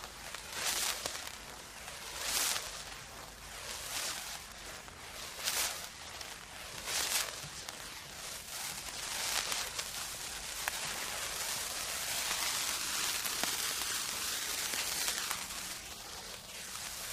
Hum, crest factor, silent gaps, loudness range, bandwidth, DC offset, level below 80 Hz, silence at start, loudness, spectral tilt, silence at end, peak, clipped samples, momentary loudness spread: none; 28 dB; none; 5 LU; 15.5 kHz; under 0.1%; -60 dBFS; 0 s; -36 LUFS; 0.5 dB/octave; 0 s; -12 dBFS; under 0.1%; 12 LU